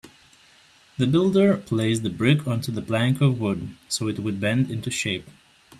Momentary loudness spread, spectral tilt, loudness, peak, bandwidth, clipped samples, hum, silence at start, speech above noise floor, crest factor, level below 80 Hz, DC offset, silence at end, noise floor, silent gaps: 8 LU; -6 dB/octave; -23 LUFS; -6 dBFS; 14 kHz; under 0.1%; none; 0.05 s; 32 dB; 18 dB; -58 dBFS; under 0.1%; 0.5 s; -55 dBFS; none